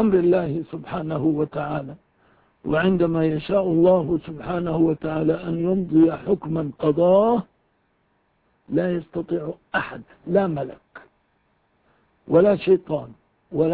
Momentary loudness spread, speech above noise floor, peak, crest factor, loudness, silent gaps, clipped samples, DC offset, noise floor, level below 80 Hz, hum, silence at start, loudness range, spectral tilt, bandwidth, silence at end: 12 LU; 46 dB; -6 dBFS; 18 dB; -22 LUFS; none; under 0.1%; under 0.1%; -67 dBFS; -52 dBFS; none; 0 s; 6 LU; -12 dB/octave; 4.7 kHz; 0 s